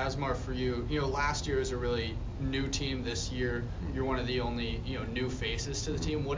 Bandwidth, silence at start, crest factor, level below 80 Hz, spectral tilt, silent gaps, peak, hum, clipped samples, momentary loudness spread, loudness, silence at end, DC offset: 7.6 kHz; 0 s; 14 dB; -40 dBFS; -5 dB/octave; none; -18 dBFS; none; under 0.1%; 4 LU; -33 LUFS; 0 s; under 0.1%